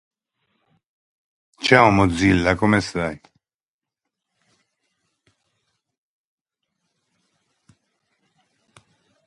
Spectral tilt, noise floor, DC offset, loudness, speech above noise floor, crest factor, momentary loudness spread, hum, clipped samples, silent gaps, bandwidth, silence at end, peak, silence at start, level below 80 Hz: -5.5 dB/octave; under -90 dBFS; under 0.1%; -18 LUFS; over 73 dB; 24 dB; 14 LU; none; under 0.1%; none; 11.5 kHz; 6.1 s; 0 dBFS; 1.6 s; -44 dBFS